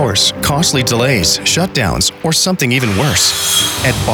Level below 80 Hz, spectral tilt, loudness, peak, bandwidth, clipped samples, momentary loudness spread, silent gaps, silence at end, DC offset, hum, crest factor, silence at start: -34 dBFS; -3 dB/octave; -12 LUFS; 0 dBFS; over 20 kHz; under 0.1%; 3 LU; none; 0 s; under 0.1%; none; 12 dB; 0 s